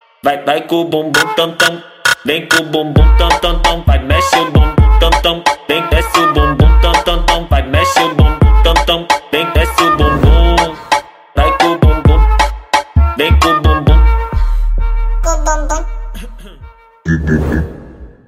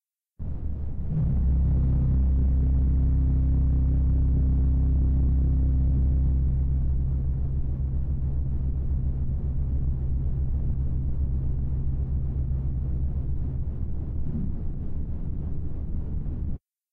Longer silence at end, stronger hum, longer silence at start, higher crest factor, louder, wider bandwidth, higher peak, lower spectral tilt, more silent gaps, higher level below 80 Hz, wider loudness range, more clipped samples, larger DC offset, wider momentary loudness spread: second, 0.2 s vs 0.35 s; neither; second, 0.25 s vs 0.4 s; about the same, 10 dB vs 6 dB; first, -12 LUFS vs -27 LUFS; first, 15.5 kHz vs 1.5 kHz; first, 0 dBFS vs -18 dBFS; second, -5 dB/octave vs -13 dB/octave; neither; first, -14 dBFS vs -26 dBFS; about the same, 5 LU vs 7 LU; neither; neither; about the same, 8 LU vs 10 LU